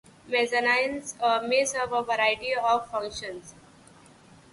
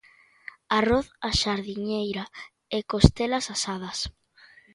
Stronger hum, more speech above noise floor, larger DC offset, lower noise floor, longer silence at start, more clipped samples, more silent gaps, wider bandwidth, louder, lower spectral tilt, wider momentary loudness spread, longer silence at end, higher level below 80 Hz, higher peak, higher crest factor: neither; about the same, 27 dB vs 30 dB; neither; about the same, -53 dBFS vs -56 dBFS; second, 0.25 s vs 0.7 s; neither; neither; about the same, 11.5 kHz vs 11.5 kHz; about the same, -26 LUFS vs -26 LUFS; second, -1.5 dB/octave vs -5 dB/octave; second, 11 LU vs 20 LU; first, 1 s vs 0.65 s; second, -62 dBFS vs -38 dBFS; second, -10 dBFS vs 0 dBFS; second, 16 dB vs 26 dB